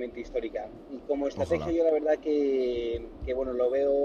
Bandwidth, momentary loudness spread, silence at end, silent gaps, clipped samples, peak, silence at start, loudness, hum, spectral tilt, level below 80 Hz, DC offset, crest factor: 9 kHz; 11 LU; 0 s; none; under 0.1%; -14 dBFS; 0 s; -29 LUFS; none; -7 dB/octave; -48 dBFS; under 0.1%; 14 dB